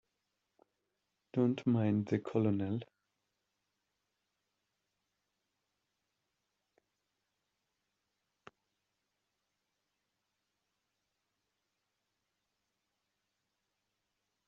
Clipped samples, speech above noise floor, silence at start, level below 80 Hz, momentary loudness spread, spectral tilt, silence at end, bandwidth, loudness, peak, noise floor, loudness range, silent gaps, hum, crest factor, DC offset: under 0.1%; 53 dB; 1.35 s; -82 dBFS; 8 LU; -8.5 dB/octave; 11.65 s; 7.4 kHz; -34 LUFS; -18 dBFS; -86 dBFS; 7 LU; none; none; 24 dB; under 0.1%